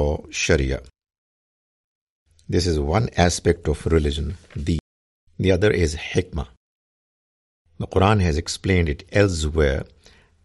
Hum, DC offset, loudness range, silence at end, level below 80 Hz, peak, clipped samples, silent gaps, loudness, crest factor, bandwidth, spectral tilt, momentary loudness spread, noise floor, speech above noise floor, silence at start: none; under 0.1%; 3 LU; 0.6 s; -34 dBFS; -2 dBFS; under 0.1%; 1.18-2.26 s, 4.80-5.27 s, 6.57-7.65 s; -22 LUFS; 20 dB; 11.5 kHz; -5.5 dB/octave; 11 LU; under -90 dBFS; over 69 dB; 0 s